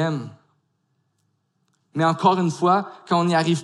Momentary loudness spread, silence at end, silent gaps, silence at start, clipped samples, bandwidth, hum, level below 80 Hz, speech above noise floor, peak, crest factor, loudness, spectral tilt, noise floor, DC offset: 12 LU; 0 s; none; 0 s; under 0.1%; 11.5 kHz; none; -74 dBFS; 50 dB; -6 dBFS; 18 dB; -21 LUFS; -6 dB/octave; -70 dBFS; under 0.1%